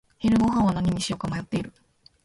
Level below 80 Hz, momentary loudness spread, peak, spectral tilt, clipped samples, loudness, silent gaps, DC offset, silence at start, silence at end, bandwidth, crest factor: -46 dBFS; 10 LU; -12 dBFS; -6 dB/octave; under 0.1%; -25 LUFS; none; under 0.1%; 0.2 s; 0.55 s; 11.5 kHz; 14 dB